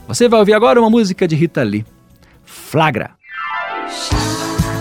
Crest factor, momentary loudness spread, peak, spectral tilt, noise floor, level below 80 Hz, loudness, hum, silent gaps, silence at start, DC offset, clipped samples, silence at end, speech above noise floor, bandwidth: 14 dB; 14 LU; -2 dBFS; -5.5 dB/octave; -47 dBFS; -34 dBFS; -15 LUFS; none; none; 0.1 s; under 0.1%; under 0.1%; 0 s; 34 dB; 17 kHz